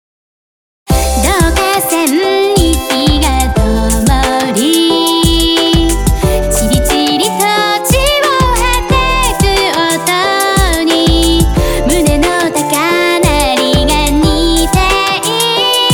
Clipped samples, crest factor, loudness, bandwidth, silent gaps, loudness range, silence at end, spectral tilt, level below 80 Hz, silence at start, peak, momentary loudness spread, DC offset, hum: under 0.1%; 10 dB; -10 LUFS; over 20 kHz; none; 1 LU; 0 s; -4 dB/octave; -18 dBFS; 0.9 s; 0 dBFS; 3 LU; under 0.1%; none